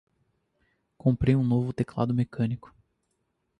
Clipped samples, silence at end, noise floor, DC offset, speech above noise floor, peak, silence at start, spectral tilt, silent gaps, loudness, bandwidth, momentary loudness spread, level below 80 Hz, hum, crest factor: under 0.1%; 1 s; -76 dBFS; under 0.1%; 51 dB; -10 dBFS; 1.05 s; -9.5 dB/octave; none; -27 LUFS; 9.4 kHz; 7 LU; -48 dBFS; none; 18 dB